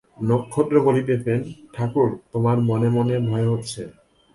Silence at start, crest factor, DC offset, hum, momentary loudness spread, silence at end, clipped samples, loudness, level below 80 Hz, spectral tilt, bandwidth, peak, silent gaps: 0.2 s; 16 dB; under 0.1%; none; 11 LU; 0.45 s; under 0.1%; -21 LUFS; -54 dBFS; -8 dB/octave; 11.5 kHz; -6 dBFS; none